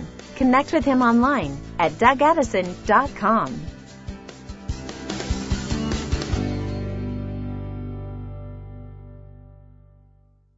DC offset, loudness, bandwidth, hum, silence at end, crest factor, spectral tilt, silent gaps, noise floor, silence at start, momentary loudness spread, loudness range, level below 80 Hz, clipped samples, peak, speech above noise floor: under 0.1%; -22 LUFS; 8 kHz; 50 Hz at -50 dBFS; 1.1 s; 22 dB; -6 dB/octave; none; -56 dBFS; 0 s; 21 LU; 14 LU; -36 dBFS; under 0.1%; -2 dBFS; 37 dB